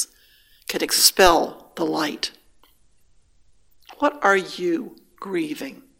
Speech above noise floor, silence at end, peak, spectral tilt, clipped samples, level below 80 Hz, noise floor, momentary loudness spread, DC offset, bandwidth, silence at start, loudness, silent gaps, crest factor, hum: 40 dB; 0.25 s; 0 dBFS; -1.5 dB/octave; under 0.1%; -48 dBFS; -61 dBFS; 15 LU; under 0.1%; 17 kHz; 0 s; -21 LUFS; none; 24 dB; none